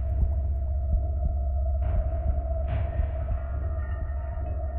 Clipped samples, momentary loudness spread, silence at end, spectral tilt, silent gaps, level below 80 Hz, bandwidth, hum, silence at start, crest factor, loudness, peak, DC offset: under 0.1%; 4 LU; 0 s; -11.5 dB/octave; none; -28 dBFS; 3 kHz; none; 0 s; 12 dB; -30 LUFS; -14 dBFS; under 0.1%